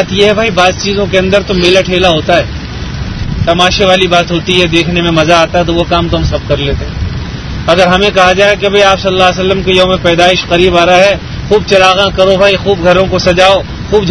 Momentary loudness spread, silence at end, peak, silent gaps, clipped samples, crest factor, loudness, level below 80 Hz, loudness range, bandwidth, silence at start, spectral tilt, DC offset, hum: 10 LU; 0 s; 0 dBFS; none; 2%; 8 dB; -8 LUFS; -24 dBFS; 3 LU; 11 kHz; 0 s; -5 dB/octave; under 0.1%; none